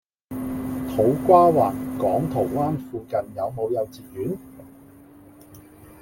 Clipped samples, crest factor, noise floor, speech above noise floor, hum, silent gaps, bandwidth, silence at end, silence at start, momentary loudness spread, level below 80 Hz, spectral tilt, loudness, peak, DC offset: under 0.1%; 20 dB; -48 dBFS; 27 dB; none; none; 17 kHz; 0.15 s; 0.3 s; 16 LU; -52 dBFS; -8.5 dB/octave; -23 LUFS; -4 dBFS; under 0.1%